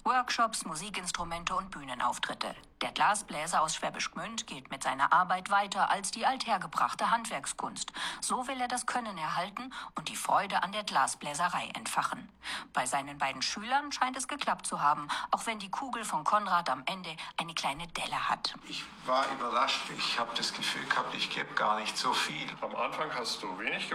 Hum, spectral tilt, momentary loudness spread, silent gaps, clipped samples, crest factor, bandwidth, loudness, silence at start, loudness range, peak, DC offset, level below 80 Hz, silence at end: none; -2 dB/octave; 8 LU; none; under 0.1%; 20 dB; 15 kHz; -32 LUFS; 0.05 s; 3 LU; -12 dBFS; under 0.1%; -64 dBFS; 0 s